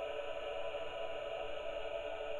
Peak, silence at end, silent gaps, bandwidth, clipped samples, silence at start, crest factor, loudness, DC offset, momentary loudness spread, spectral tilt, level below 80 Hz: -30 dBFS; 0 s; none; 11.5 kHz; under 0.1%; 0 s; 12 dB; -42 LUFS; under 0.1%; 1 LU; -3.5 dB/octave; -58 dBFS